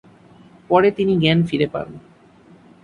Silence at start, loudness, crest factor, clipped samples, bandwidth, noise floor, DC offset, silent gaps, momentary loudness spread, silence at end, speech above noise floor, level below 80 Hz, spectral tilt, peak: 0.7 s; -18 LUFS; 18 dB; under 0.1%; 10 kHz; -49 dBFS; under 0.1%; none; 11 LU; 0.85 s; 31 dB; -52 dBFS; -8 dB/octave; -2 dBFS